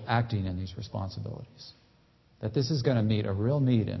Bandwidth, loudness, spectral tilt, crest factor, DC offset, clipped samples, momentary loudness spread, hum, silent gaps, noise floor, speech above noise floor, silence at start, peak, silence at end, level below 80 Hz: 6.2 kHz; -30 LUFS; -7.5 dB/octave; 18 dB; under 0.1%; under 0.1%; 17 LU; none; none; -63 dBFS; 34 dB; 0 s; -10 dBFS; 0 s; -50 dBFS